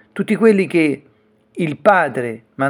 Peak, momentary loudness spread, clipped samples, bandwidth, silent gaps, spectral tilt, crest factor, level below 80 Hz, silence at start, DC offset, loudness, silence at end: 0 dBFS; 14 LU; under 0.1%; 12 kHz; none; -7 dB/octave; 18 dB; -66 dBFS; 0.15 s; under 0.1%; -16 LUFS; 0 s